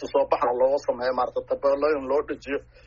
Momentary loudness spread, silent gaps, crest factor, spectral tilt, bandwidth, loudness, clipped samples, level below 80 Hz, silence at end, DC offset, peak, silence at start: 7 LU; none; 16 dB; -3 dB/octave; 7.4 kHz; -25 LUFS; under 0.1%; -54 dBFS; 0.25 s; under 0.1%; -8 dBFS; 0 s